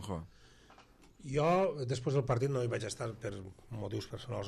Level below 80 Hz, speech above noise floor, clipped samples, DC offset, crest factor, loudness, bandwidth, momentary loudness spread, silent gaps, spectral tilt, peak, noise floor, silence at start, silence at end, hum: -60 dBFS; 25 dB; under 0.1%; under 0.1%; 18 dB; -35 LUFS; 12.5 kHz; 16 LU; none; -6.5 dB/octave; -18 dBFS; -60 dBFS; 0 s; 0 s; none